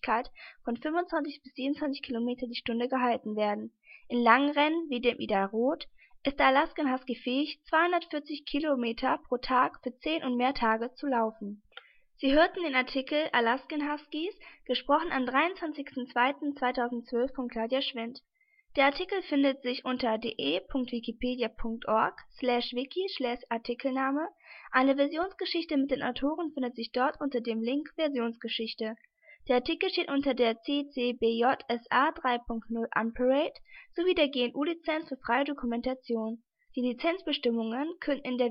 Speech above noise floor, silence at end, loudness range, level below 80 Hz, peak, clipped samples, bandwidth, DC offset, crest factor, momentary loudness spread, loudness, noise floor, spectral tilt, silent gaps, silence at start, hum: 25 dB; 0 s; 3 LU; -56 dBFS; -6 dBFS; under 0.1%; 5.8 kHz; under 0.1%; 24 dB; 9 LU; -30 LUFS; -55 dBFS; -7.5 dB/octave; none; 0.05 s; none